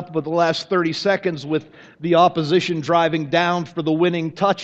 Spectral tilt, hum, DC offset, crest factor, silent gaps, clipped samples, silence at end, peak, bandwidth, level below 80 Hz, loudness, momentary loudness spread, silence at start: -6 dB/octave; none; under 0.1%; 18 dB; none; under 0.1%; 0 s; -2 dBFS; 8.2 kHz; -62 dBFS; -19 LUFS; 7 LU; 0 s